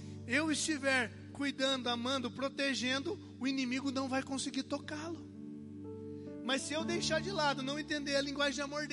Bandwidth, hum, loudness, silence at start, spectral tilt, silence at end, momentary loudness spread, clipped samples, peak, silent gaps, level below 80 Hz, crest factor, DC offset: 11.5 kHz; none; -35 LUFS; 0 s; -3 dB/octave; 0 s; 13 LU; under 0.1%; -18 dBFS; none; -64 dBFS; 18 dB; under 0.1%